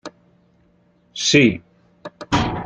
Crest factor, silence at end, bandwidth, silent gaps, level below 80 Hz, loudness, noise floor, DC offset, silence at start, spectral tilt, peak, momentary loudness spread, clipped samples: 20 dB; 0 s; 9.4 kHz; none; -42 dBFS; -17 LUFS; -58 dBFS; under 0.1%; 0.05 s; -4 dB/octave; -2 dBFS; 26 LU; under 0.1%